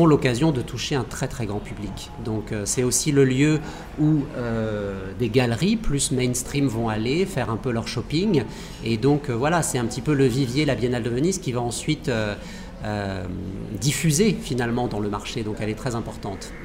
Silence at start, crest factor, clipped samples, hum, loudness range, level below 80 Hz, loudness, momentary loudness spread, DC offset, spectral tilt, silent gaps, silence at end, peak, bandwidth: 0 s; 18 dB; under 0.1%; none; 3 LU; -40 dBFS; -24 LUFS; 11 LU; under 0.1%; -5 dB/octave; none; 0 s; -6 dBFS; 16 kHz